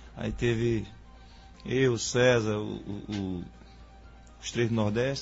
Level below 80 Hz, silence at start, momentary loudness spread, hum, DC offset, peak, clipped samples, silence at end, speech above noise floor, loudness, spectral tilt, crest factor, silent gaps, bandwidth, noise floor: -48 dBFS; 0 s; 16 LU; none; under 0.1%; -12 dBFS; under 0.1%; 0 s; 22 dB; -29 LUFS; -5.5 dB/octave; 18 dB; none; 8 kHz; -50 dBFS